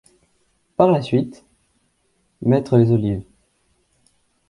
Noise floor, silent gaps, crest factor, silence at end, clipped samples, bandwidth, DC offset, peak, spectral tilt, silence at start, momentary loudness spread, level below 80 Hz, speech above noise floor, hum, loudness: -66 dBFS; none; 20 dB; 1.25 s; under 0.1%; 11 kHz; under 0.1%; 0 dBFS; -9 dB/octave; 0.8 s; 14 LU; -50 dBFS; 49 dB; none; -19 LUFS